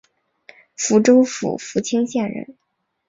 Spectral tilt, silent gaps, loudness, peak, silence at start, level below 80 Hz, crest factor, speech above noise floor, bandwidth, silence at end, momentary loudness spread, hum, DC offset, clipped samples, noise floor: -4.5 dB/octave; none; -18 LUFS; -2 dBFS; 0.8 s; -64 dBFS; 18 dB; 33 dB; 7.8 kHz; 0.55 s; 14 LU; none; under 0.1%; under 0.1%; -50 dBFS